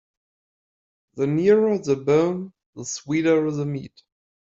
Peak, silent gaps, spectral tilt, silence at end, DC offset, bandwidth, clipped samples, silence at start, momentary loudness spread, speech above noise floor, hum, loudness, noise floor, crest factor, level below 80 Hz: -6 dBFS; 2.66-2.73 s; -6 dB/octave; 0.7 s; under 0.1%; 7.8 kHz; under 0.1%; 1.15 s; 14 LU; over 69 dB; none; -22 LUFS; under -90 dBFS; 18 dB; -64 dBFS